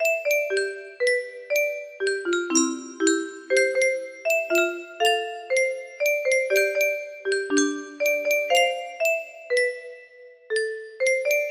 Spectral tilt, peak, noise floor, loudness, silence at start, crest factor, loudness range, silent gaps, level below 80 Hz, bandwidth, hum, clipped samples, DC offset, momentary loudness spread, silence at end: 0 dB/octave; -8 dBFS; -48 dBFS; -24 LUFS; 0 s; 16 dB; 2 LU; none; -74 dBFS; 15.5 kHz; none; under 0.1%; under 0.1%; 7 LU; 0 s